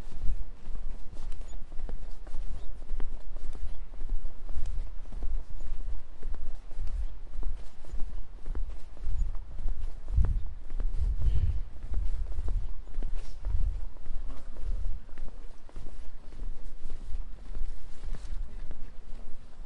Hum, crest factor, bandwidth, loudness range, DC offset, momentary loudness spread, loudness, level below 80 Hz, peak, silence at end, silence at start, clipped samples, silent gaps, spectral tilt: none; 14 dB; 2.2 kHz; 10 LU; under 0.1%; 12 LU; -40 LUFS; -32 dBFS; -10 dBFS; 0 s; 0 s; under 0.1%; none; -7 dB/octave